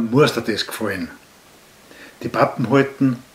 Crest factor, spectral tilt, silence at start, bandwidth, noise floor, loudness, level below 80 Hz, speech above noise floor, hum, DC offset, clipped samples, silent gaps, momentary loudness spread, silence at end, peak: 20 dB; -6 dB/octave; 0 s; 16 kHz; -48 dBFS; -20 LUFS; -58 dBFS; 29 dB; none; under 0.1%; under 0.1%; none; 12 LU; 0.1 s; 0 dBFS